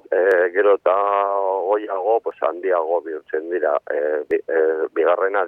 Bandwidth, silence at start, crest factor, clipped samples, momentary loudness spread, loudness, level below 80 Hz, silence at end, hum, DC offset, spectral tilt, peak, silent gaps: 3.9 kHz; 0.1 s; 14 dB; under 0.1%; 7 LU; -20 LUFS; -72 dBFS; 0 s; none; under 0.1%; -5.5 dB/octave; -4 dBFS; none